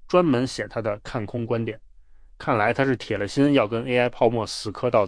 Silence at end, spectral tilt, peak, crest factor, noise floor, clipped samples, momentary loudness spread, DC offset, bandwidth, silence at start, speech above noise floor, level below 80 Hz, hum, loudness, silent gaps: 0 s; -6 dB/octave; -6 dBFS; 18 dB; -48 dBFS; under 0.1%; 10 LU; under 0.1%; 10.5 kHz; 0 s; 25 dB; -50 dBFS; none; -24 LUFS; none